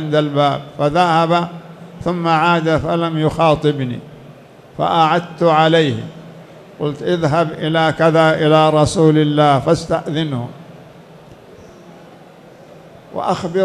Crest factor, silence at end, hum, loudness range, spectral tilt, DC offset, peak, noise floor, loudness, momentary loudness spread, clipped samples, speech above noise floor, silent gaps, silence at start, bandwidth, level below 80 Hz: 16 dB; 0 s; none; 9 LU; -6.5 dB/octave; under 0.1%; 0 dBFS; -41 dBFS; -15 LUFS; 13 LU; under 0.1%; 26 dB; none; 0 s; 11.5 kHz; -46 dBFS